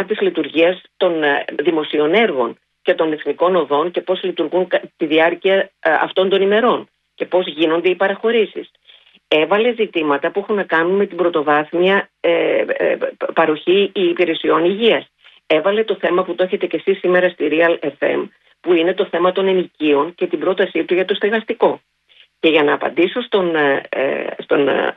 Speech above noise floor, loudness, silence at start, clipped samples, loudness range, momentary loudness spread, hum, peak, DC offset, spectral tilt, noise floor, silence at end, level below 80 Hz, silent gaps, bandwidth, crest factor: 36 dB; -17 LUFS; 0 s; under 0.1%; 1 LU; 5 LU; none; 0 dBFS; under 0.1%; -7.5 dB/octave; -52 dBFS; 0.05 s; -66 dBFS; none; 4.7 kHz; 16 dB